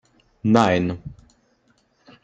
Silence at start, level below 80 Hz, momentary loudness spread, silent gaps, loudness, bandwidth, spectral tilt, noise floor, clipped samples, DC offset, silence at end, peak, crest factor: 0.45 s; -54 dBFS; 19 LU; none; -20 LUFS; 8.6 kHz; -6.5 dB/octave; -63 dBFS; under 0.1%; under 0.1%; 1.1 s; -2 dBFS; 22 dB